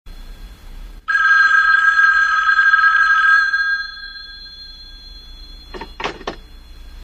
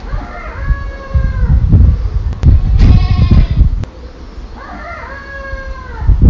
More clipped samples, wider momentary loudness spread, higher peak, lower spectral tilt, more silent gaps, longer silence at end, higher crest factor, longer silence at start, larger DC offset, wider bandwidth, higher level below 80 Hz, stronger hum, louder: second, under 0.1% vs 3%; first, 23 LU vs 18 LU; about the same, -2 dBFS vs 0 dBFS; second, -1.5 dB/octave vs -8.5 dB/octave; neither; about the same, 0 s vs 0 s; first, 16 dB vs 10 dB; about the same, 0.05 s vs 0 s; neither; first, 8.6 kHz vs 6.4 kHz; second, -40 dBFS vs -12 dBFS; neither; about the same, -12 LUFS vs -13 LUFS